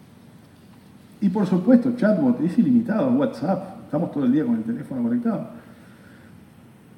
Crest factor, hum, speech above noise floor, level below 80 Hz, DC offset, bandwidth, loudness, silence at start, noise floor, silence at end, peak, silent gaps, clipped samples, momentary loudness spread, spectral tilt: 18 dB; none; 28 dB; -66 dBFS; under 0.1%; 10 kHz; -22 LUFS; 1.2 s; -48 dBFS; 1.25 s; -4 dBFS; none; under 0.1%; 10 LU; -9 dB/octave